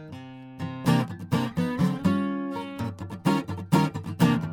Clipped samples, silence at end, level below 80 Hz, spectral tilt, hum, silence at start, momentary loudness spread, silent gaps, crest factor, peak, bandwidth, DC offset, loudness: under 0.1%; 0 s; -58 dBFS; -7 dB/octave; none; 0 s; 12 LU; none; 18 dB; -8 dBFS; over 20 kHz; under 0.1%; -27 LUFS